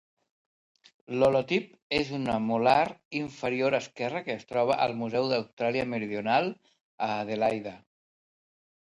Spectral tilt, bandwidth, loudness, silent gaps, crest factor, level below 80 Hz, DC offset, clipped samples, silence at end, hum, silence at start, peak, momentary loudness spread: -6 dB/octave; 11 kHz; -28 LUFS; 1.82-1.90 s, 3.05-3.11 s, 5.53-5.57 s, 6.81-6.98 s; 22 dB; -62 dBFS; under 0.1%; under 0.1%; 1.1 s; none; 1.1 s; -8 dBFS; 10 LU